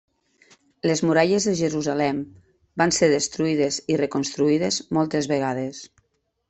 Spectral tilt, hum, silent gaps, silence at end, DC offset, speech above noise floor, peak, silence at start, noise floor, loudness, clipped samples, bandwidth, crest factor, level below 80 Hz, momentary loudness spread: -4.5 dB/octave; none; none; 0.65 s; under 0.1%; 48 dB; -4 dBFS; 0.85 s; -70 dBFS; -22 LUFS; under 0.1%; 8.4 kHz; 20 dB; -60 dBFS; 10 LU